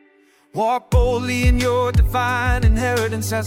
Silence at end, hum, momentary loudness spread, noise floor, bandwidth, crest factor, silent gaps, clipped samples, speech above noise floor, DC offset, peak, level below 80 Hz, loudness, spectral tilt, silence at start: 0 s; none; 4 LU; -55 dBFS; 16.5 kHz; 14 dB; none; under 0.1%; 38 dB; under 0.1%; -4 dBFS; -22 dBFS; -19 LUFS; -5.5 dB/octave; 0.55 s